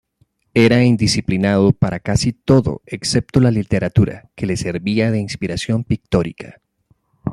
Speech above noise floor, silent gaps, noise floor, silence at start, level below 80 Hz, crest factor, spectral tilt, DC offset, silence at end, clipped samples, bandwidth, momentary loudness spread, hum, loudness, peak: 45 dB; none; -61 dBFS; 0.55 s; -40 dBFS; 16 dB; -6 dB/octave; under 0.1%; 0 s; under 0.1%; 12.5 kHz; 10 LU; none; -17 LUFS; 0 dBFS